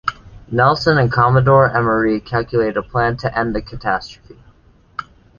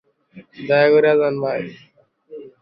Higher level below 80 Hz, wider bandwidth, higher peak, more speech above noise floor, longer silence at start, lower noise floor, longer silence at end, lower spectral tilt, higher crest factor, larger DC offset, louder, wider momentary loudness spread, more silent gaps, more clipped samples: first, -40 dBFS vs -66 dBFS; first, 7 kHz vs 5.6 kHz; about the same, 0 dBFS vs -2 dBFS; first, 34 dB vs 30 dB; second, 0.05 s vs 0.35 s; first, -50 dBFS vs -46 dBFS; first, 0.35 s vs 0.15 s; about the same, -7.5 dB/octave vs -8.5 dB/octave; about the same, 16 dB vs 18 dB; neither; about the same, -16 LUFS vs -17 LUFS; second, 17 LU vs 23 LU; neither; neither